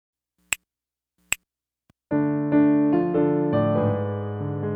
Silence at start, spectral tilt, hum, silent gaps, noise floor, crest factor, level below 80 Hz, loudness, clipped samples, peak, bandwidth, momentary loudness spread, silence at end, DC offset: 0.5 s; -6 dB/octave; none; none; -90 dBFS; 20 dB; -60 dBFS; -23 LUFS; under 0.1%; -4 dBFS; 19 kHz; 10 LU; 0 s; under 0.1%